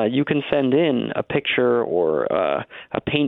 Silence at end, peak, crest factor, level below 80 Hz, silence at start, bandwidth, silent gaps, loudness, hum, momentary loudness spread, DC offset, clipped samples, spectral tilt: 0 s; -6 dBFS; 14 dB; -56 dBFS; 0 s; 4.1 kHz; none; -21 LUFS; none; 6 LU; under 0.1%; under 0.1%; -9.5 dB/octave